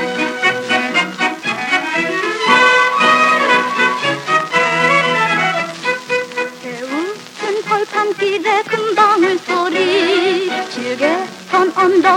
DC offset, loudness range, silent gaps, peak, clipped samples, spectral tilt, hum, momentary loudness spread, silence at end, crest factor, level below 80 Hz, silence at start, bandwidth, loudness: under 0.1%; 6 LU; none; 0 dBFS; under 0.1%; -3.5 dB/octave; none; 10 LU; 0 s; 16 dB; -70 dBFS; 0 s; 16 kHz; -14 LUFS